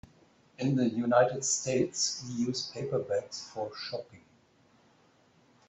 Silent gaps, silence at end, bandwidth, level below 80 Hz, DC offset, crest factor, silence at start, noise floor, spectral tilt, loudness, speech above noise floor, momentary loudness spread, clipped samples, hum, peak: none; 1.5 s; 8.4 kHz; -70 dBFS; under 0.1%; 22 dB; 0.6 s; -65 dBFS; -4 dB/octave; -31 LUFS; 34 dB; 13 LU; under 0.1%; none; -10 dBFS